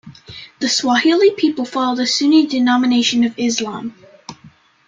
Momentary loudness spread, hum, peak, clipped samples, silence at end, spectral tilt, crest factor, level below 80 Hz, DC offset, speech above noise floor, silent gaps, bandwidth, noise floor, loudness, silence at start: 16 LU; none; -2 dBFS; under 0.1%; 0.4 s; -2.5 dB/octave; 14 dB; -62 dBFS; under 0.1%; 31 dB; none; 9.4 kHz; -47 dBFS; -15 LUFS; 0.05 s